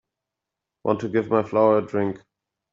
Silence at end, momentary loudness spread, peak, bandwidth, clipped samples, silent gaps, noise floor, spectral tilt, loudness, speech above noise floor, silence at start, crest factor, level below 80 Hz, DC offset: 0.55 s; 11 LU; -4 dBFS; 7.4 kHz; under 0.1%; none; -86 dBFS; -7 dB/octave; -22 LUFS; 64 dB; 0.85 s; 20 dB; -66 dBFS; under 0.1%